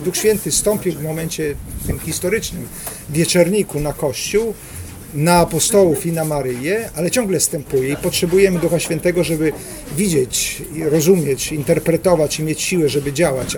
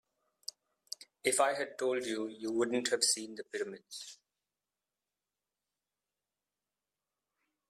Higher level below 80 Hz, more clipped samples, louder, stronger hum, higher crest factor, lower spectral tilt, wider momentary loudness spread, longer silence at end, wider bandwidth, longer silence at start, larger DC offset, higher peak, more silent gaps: first, -38 dBFS vs -82 dBFS; neither; first, -17 LUFS vs -33 LUFS; second, none vs 50 Hz at -80 dBFS; second, 18 dB vs 24 dB; first, -4.5 dB/octave vs -1.5 dB/octave; second, 10 LU vs 17 LU; second, 0 s vs 3.55 s; first, 19 kHz vs 15 kHz; second, 0 s vs 1 s; neither; first, 0 dBFS vs -14 dBFS; neither